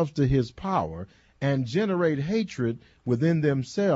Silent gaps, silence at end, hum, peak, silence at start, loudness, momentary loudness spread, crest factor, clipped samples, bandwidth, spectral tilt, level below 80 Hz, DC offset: none; 0 s; none; -12 dBFS; 0 s; -26 LUFS; 9 LU; 14 dB; under 0.1%; 8 kHz; -7.5 dB/octave; -48 dBFS; under 0.1%